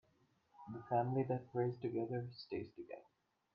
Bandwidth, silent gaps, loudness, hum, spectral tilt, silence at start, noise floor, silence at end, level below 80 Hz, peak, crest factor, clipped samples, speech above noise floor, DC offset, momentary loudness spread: 5.6 kHz; none; -41 LUFS; none; -7.5 dB/octave; 0.6 s; -76 dBFS; 0.55 s; -78 dBFS; -24 dBFS; 18 dB; under 0.1%; 36 dB; under 0.1%; 16 LU